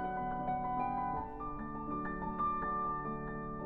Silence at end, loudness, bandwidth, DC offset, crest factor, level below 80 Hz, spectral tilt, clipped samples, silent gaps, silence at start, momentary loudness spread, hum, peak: 0 s; -38 LUFS; 4.3 kHz; under 0.1%; 12 dB; -52 dBFS; -10 dB/octave; under 0.1%; none; 0 s; 7 LU; none; -24 dBFS